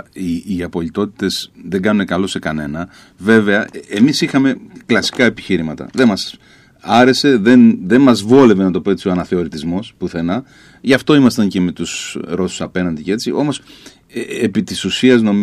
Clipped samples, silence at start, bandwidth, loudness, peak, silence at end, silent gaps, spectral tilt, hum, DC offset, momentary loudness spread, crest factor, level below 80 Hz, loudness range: under 0.1%; 0.15 s; 14 kHz; -15 LUFS; 0 dBFS; 0 s; none; -5.5 dB/octave; none; under 0.1%; 13 LU; 14 dB; -48 dBFS; 7 LU